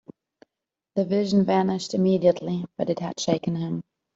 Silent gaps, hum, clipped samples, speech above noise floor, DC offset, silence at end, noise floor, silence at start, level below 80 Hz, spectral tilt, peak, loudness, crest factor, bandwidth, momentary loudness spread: none; none; under 0.1%; 63 dB; under 0.1%; 0.35 s; -86 dBFS; 0.95 s; -64 dBFS; -6.5 dB/octave; -6 dBFS; -24 LUFS; 18 dB; 7.8 kHz; 10 LU